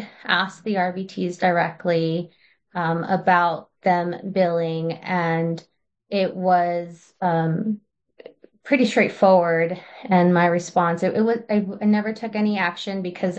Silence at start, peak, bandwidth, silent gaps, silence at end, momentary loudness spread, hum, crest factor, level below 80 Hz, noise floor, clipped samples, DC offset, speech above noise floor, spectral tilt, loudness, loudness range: 0 s; -4 dBFS; 8.6 kHz; none; 0 s; 10 LU; none; 18 dB; -70 dBFS; -47 dBFS; under 0.1%; under 0.1%; 26 dB; -6.5 dB/octave; -21 LUFS; 4 LU